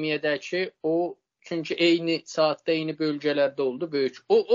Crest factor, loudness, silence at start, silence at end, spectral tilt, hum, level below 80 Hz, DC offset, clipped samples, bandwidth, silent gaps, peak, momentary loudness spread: 16 dB; -26 LUFS; 0 s; 0 s; -3 dB/octave; none; -76 dBFS; under 0.1%; under 0.1%; 7.4 kHz; none; -10 dBFS; 7 LU